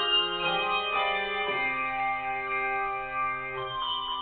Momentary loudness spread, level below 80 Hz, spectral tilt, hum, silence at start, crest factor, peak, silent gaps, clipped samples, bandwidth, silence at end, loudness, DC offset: 5 LU; -56 dBFS; -6 dB/octave; none; 0 s; 14 dB; -16 dBFS; none; under 0.1%; 4.7 kHz; 0 s; -28 LUFS; under 0.1%